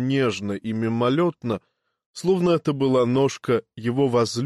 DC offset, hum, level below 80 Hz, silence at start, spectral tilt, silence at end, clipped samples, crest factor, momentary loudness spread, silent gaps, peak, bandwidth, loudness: under 0.1%; none; -62 dBFS; 0 s; -6.5 dB/octave; 0 s; under 0.1%; 12 dB; 9 LU; 2.06-2.14 s; -10 dBFS; 12.5 kHz; -23 LUFS